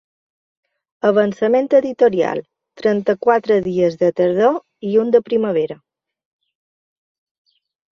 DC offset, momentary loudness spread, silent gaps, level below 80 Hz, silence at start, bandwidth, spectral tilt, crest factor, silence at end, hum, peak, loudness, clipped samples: under 0.1%; 7 LU; none; -62 dBFS; 1.05 s; 7 kHz; -7.5 dB/octave; 16 dB; 2.2 s; none; -2 dBFS; -17 LUFS; under 0.1%